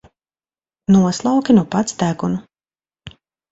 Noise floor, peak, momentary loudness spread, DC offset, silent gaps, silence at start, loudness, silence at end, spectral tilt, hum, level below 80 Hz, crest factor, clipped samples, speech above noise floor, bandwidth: under -90 dBFS; -2 dBFS; 10 LU; under 0.1%; none; 0.9 s; -17 LUFS; 0.4 s; -6.5 dB/octave; none; -52 dBFS; 18 dB; under 0.1%; over 75 dB; 8 kHz